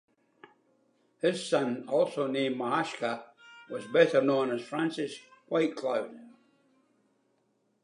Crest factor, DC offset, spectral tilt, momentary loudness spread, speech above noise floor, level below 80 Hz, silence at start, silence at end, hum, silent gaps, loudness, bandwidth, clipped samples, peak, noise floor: 22 dB; under 0.1%; -5 dB/octave; 14 LU; 44 dB; -86 dBFS; 1.25 s; 1.55 s; none; none; -30 LUFS; 11 kHz; under 0.1%; -10 dBFS; -73 dBFS